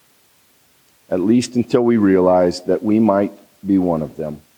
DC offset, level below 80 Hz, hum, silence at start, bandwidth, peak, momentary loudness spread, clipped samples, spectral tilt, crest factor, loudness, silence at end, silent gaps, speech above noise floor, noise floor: under 0.1%; -58 dBFS; none; 1.1 s; 19 kHz; -2 dBFS; 11 LU; under 0.1%; -7 dB/octave; 16 dB; -17 LUFS; 0.2 s; none; 40 dB; -56 dBFS